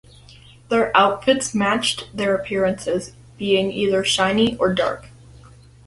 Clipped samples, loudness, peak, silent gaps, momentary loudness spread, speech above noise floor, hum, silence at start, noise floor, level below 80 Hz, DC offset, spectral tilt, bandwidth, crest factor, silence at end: under 0.1%; -20 LUFS; -2 dBFS; none; 9 LU; 27 dB; none; 0.7 s; -46 dBFS; -50 dBFS; under 0.1%; -4 dB/octave; 11.5 kHz; 20 dB; 0.8 s